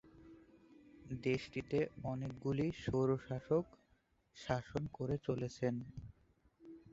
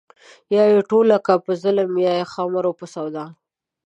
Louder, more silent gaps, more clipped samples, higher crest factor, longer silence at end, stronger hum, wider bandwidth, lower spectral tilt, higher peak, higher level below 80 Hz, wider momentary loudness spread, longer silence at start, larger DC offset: second, -40 LUFS vs -19 LUFS; neither; neither; about the same, 22 dB vs 18 dB; second, 0 s vs 0.55 s; neither; about the same, 8 kHz vs 8.4 kHz; about the same, -7 dB/octave vs -7 dB/octave; second, -20 dBFS vs -2 dBFS; first, -62 dBFS vs -74 dBFS; first, 20 LU vs 14 LU; second, 0.05 s vs 0.5 s; neither